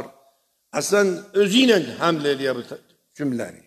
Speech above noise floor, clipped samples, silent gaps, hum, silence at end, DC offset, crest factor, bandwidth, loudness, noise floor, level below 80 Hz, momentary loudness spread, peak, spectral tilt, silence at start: 42 dB; under 0.1%; none; none; 0.15 s; under 0.1%; 20 dB; 14.5 kHz; -21 LUFS; -63 dBFS; -72 dBFS; 16 LU; -2 dBFS; -4 dB/octave; 0 s